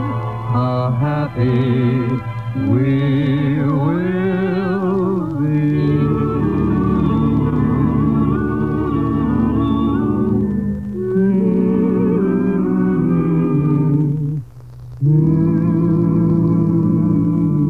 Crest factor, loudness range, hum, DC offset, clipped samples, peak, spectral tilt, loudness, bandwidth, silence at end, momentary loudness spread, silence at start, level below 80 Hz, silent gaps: 12 dB; 1 LU; none; 0.5%; under 0.1%; -4 dBFS; -10.5 dB/octave; -17 LUFS; 4.5 kHz; 0 s; 5 LU; 0 s; -34 dBFS; none